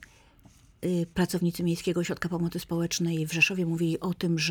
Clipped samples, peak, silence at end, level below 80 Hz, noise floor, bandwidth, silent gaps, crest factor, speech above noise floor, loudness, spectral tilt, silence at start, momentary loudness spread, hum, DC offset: under 0.1%; -10 dBFS; 0 s; -56 dBFS; -57 dBFS; 19 kHz; none; 20 dB; 29 dB; -28 LUFS; -5 dB/octave; 0 s; 7 LU; none; under 0.1%